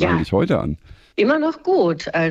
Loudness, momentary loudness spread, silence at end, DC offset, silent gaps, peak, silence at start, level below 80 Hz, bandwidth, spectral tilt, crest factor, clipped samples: -19 LUFS; 10 LU; 0 s; under 0.1%; none; -4 dBFS; 0 s; -44 dBFS; 10 kHz; -7.5 dB/octave; 16 dB; under 0.1%